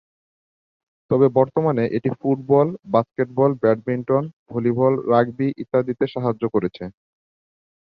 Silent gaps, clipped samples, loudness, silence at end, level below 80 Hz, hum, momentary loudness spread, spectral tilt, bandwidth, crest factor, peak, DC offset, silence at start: 4.33-4.46 s; under 0.1%; -20 LUFS; 1.05 s; -60 dBFS; none; 7 LU; -10.5 dB/octave; 5.4 kHz; 18 dB; -2 dBFS; under 0.1%; 1.1 s